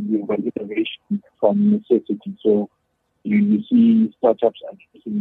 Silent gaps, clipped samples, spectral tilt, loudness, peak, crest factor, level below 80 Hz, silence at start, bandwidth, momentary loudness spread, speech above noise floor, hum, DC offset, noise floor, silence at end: none; under 0.1%; -10 dB/octave; -19 LUFS; -4 dBFS; 16 dB; -68 dBFS; 0 s; 3.9 kHz; 14 LU; 33 dB; none; under 0.1%; -52 dBFS; 0 s